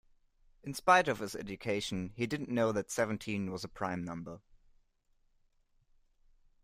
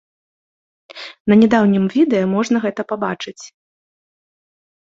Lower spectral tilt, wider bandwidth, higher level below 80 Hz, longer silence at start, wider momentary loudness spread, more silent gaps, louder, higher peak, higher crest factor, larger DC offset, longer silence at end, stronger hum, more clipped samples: second, -4.5 dB/octave vs -6.5 dB/octave; first, 15.5 kHz vs 7.6 kHz; second, -64 dBFS vs -58 dBFS; second, 0.65 s vs 0.95 s; about the same, 17 LU vs 17 LU; second, none vs 1.20-1.25 s; second, -34 LUFS vs -16 LUFS; second, -12 dBFS vs -2 dBFS; first, 24 dB vs 16 dB; neither; first, 2.25 s vs 1.4 s; neither; neither